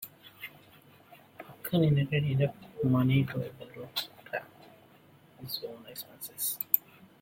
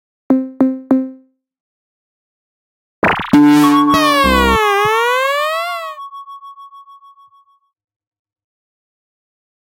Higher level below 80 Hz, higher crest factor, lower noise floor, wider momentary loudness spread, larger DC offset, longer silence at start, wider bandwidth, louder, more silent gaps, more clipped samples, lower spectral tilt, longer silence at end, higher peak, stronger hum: second, -66 dBFS vs -36 dBFS; first, 28 dB vs 16 dB; first, -59 dBFS vs -54 dBFS; about the same, 20 LU vs 19 LU; neither; second, 0 s vs 0.3 s; about the same, 16.5 kHz vs 16.5 kHz; second, -31 LUFS vs -13 LUFS; second, none vs 1.60-3.02 s; neither; about the same, -6 dB/octave vs -5 dB/octave; second, 0.4 s vs 2.9 s; second, -4 dBFS vs 0 dBFS; neither